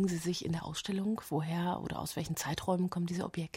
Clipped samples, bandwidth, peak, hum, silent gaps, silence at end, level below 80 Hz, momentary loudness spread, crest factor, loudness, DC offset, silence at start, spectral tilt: under 0.1%; 16 kHz; -18 dBFS; none; none; 0.1 s; -60 dBFS; 4 LU; 16 dB; -35 LUFS; under 0.1%; 0 s; -5.5 dB/octave